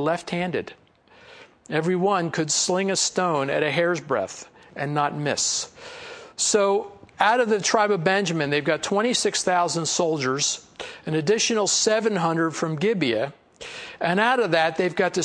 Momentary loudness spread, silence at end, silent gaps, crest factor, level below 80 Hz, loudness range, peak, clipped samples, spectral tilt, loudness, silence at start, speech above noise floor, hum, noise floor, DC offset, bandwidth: 15 LU; 0 s; none; 20 dB; -66 dBFS; 3 LU; -4 dBFS; under 0.1%; -3 dB/octave; -22 LUFS; 0 s; 28 dB; none; -51 dBFS; under 0.1%; 10.5 kHz